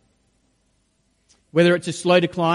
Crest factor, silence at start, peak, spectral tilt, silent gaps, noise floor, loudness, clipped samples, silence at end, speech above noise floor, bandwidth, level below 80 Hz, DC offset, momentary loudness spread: 18 dB; 1.55 s; -4 dBFS; -5.5 dB/octave; none; -66 dBFS; -19 LUFS; under 0.1%; 0 s; 48 dB; 11.5 kHz; -64 dBFS; under 0.1%; 5 LU